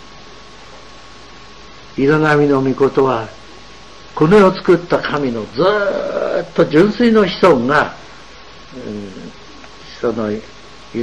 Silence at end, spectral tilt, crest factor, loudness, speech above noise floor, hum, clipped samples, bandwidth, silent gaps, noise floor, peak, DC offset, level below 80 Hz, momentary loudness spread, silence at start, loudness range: 0 s; -6.5 dB/octave; 14 dB; -14 LUFS; 25 dB; none; under 0.1%; 10 kHz; none; -38 dBFS; -2 dBFS; 0.9%; -46 dBFS; 20 LU; 0.7 s; 4 LU